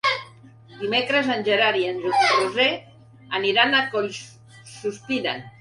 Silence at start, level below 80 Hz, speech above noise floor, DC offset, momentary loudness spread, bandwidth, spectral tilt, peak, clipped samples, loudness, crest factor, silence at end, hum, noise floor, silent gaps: 0.05 s; -66 dBFS; 25 dB; under 0.1%; 13 LU; 11.5 kHz; -3.5 dB/octave; -4 dBFS; under 0.1%; -21 LUFS; 20 dB; 0.1 s; none; -47 dBFS; none